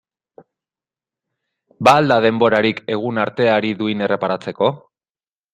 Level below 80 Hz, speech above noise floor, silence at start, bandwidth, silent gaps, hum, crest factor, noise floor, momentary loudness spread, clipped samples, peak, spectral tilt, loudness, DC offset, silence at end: -60 dBFS; over 74 dB; 1.8 s; 13.5 kHz; none; none; 18 dB; under -90 dBFS; 8 LU; under 0.1%; 0 dBFS; -6 dB/octave; -17 LUFS; under 0.1%; 0.75 s